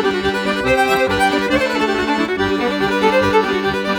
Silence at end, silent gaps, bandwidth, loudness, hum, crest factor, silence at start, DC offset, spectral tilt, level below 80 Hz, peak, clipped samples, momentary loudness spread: 0 s; none; over 20 kHz; -16 LUFS; none; 14 dB; 0 s; under 0.1%; -4.5 dB/octave; -40 dBFS; -2 dBFS; under 0.1%; 4 LU